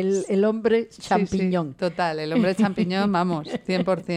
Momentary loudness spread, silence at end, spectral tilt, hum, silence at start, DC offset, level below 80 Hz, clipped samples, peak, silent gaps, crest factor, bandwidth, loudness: 5 LU; 0 s; -6.5 dB/octave; none; 0 s; under 0.1%; -56 dBFS; under 0.1%; -8 dBFS; none; 16 dB; 11 kHz; -23 LUFS